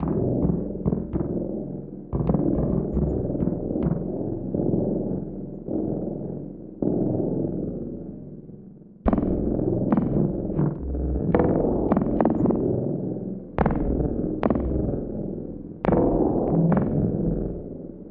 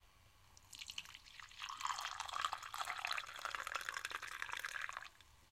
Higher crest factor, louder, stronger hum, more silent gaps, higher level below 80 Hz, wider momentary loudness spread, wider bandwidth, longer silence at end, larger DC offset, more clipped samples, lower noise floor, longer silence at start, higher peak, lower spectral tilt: second, 20 dB vs 26 dB; first, -25 LUFS vs -45 LUFS; neither; neither; first, -36 dBFS vs -74 dBFS; about the same, 13 LU vs 13 LU; second, 3.7 kHz vs 16.5 kHz; about the same, 0 s vs 0.05 s; neither; neither; second, -45 dBFS vs -68 dBFS; about the same, 0 s vs 0.05 s; first, -6 dBFS vs -20 dBFS; first, -13 dB/octave vs 1 dB/octave